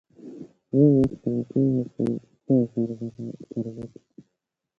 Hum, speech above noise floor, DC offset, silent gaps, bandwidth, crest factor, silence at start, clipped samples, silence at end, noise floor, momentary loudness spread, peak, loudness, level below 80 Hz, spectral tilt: none; 59 dB; under 0.1%; none; 5.8 kHz; 18 dB; 0.25 s; under 0.1%; 0.9 s; -82 dBFS; 23 LU; -8 dBFS; -25 LUFS; -56 dBFS; -11.5 dB/octave